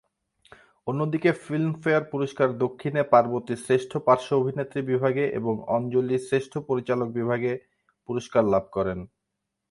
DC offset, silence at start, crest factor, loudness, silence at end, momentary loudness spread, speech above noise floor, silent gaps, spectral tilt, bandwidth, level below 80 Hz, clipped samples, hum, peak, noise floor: under 0.1%; 0.85 s; 20 dB; -25 LUFS; 0.65 s; 9 LU; 58 dB; none; -7 dB/octave; 11.5 kHz; -60 dBFS; under 0.1%; none; -4 dBFS; -82 dBFS